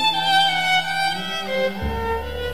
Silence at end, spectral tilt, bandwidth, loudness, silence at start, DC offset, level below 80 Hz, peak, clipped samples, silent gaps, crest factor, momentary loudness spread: 0 s; -3 dB/octave; 15.5 kHz; -20 LUFS; 0 s; 1%; -36 dBFS; -6 dBFS; under 0.1%; none; 16 dB; 9 LU